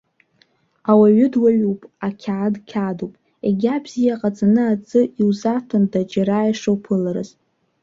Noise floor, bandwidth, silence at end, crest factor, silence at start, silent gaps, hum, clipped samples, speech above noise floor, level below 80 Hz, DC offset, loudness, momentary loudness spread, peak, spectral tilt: -60 dBFS; 7.4 kHz; 0.55 s; 16 dB; 0.85 s; none; none; under 0.1%; 42 dB; -60 dBFS; under 0.1%; -19 LUFS; 12 LU; -2 dBFS; -8 dB/octave